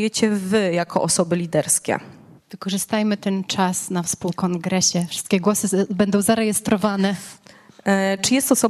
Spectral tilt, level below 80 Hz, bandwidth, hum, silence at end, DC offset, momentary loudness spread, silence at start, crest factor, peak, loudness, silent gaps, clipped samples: -4 dB/octave; -58 dBFS; 14 kHz; none; 0 s; under 0.1%; 6 LU; 0 s; 18 dB; -4 dBFS; -20 LUFS; none; under 0.1%